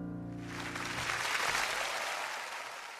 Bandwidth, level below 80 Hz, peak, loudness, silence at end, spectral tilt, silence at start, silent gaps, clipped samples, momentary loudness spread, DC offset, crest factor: 14 kHz; -62 dBFS; -18 dBFS; -35 LUFS; 0 s; -2 dB/octave; 0 s; none; under 0.1%; 11 LU; under 0.1%; 18 dB